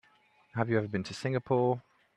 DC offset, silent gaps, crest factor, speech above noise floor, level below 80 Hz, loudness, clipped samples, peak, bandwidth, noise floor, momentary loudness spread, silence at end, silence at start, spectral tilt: under 0.1%; none; 20 dB; 35 dB; -70 dBFS; -32 LUFS; under 0.1%; -12 dBFS; 10.5 kHz; -66 dBFS; 8 LU; 0.35 s; 0.55 s; -7 dB/octave